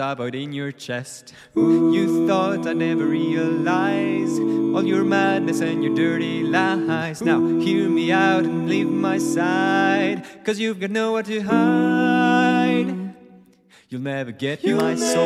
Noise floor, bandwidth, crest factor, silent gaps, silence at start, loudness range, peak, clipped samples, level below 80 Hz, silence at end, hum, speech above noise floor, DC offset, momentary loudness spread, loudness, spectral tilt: -53 dBFS; 13 kHz; 16 dB; none; 0 s; 2 LU; -6 dBFS; under 0.1%; -70 dBFS; 0 s; none; 33 dB; under 0.1%; 10 LU; -20 LUFS; -5.5 dB/octave